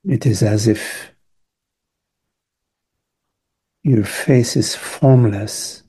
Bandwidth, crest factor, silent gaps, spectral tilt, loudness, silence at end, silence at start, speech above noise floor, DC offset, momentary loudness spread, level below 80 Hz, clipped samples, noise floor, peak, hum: 12.5 kHz; 18 dB; none; -6 dB/octave; -16 LUFS; 0.15 s; 0.05 s; 64 dB; under 0.1%; 11 LU; -54 dBFS; under 0.1%; -79 dBFS; -2 dBFS; none